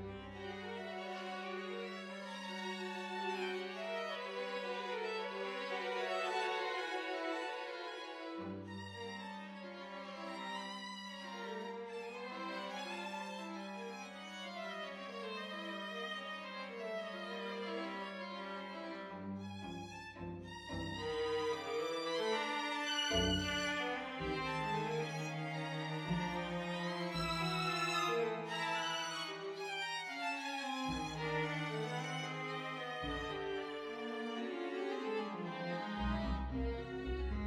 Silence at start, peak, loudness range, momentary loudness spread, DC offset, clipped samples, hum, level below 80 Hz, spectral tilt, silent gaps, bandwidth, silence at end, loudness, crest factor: 0 s; -22 dBFS; 8 LU; 10 LU; under 0.1%; under 0.1%; none; -56 dBFS; -4.5 dB/octave; none; 16 kHz; 0 s; -41 LUFS; 18 dB